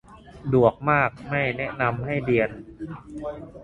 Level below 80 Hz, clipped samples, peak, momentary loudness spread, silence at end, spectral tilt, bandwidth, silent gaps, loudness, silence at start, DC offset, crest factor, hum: -50 dBFS; under 0.1%; -4 dBFS; 17 LU; 0 s; -8.5 dB/octave; 9.8 kHz; none; -23 LUFS; 0.1 s; under 0.1%; 22 dB; none